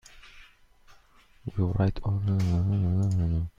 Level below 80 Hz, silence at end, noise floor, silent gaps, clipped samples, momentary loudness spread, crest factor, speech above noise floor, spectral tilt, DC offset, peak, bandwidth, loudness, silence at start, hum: -44 dBFS; 0.1 s; -57 dBFS; none; under 0.1%; 5 LU; 16 dB; 32 dB; -9 dB/octave; under 0.1%; -12 dBFS; 7.4 kHz; -27 LUFS; 0.15 s; none